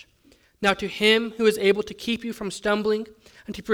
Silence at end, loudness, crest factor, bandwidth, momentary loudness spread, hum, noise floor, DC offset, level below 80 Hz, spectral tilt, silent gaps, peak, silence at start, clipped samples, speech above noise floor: 0 s; -23 LUFS; 18 dB; 18 kHz; 17 LU; none; -59 dBFS; under 0.1%; -56 dBFS; -4 dB/octave; none; -6 dBFS; 0.6 s; under 0.1%; 35 dB